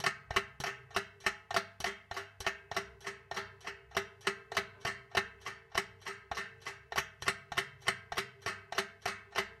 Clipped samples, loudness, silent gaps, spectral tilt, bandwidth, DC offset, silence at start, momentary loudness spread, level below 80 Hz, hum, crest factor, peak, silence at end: under 0.1%; -38 LUFS; none; -2 dB/octave; 16 kHz; under 0.1%; 0 s; 10 LU; -62 dBFS; none; 26 dB; -12 dBFS; 0 s